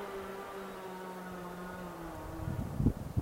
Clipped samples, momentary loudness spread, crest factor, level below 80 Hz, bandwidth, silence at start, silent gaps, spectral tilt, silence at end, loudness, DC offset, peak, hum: under 0.1%; 10 LU; 24 dB; -48 dBFS; 16 kHz; 0 s; none; -7 dB/octave; 0 s; -40 LUFS; under 0.1%; -16 dBFS; none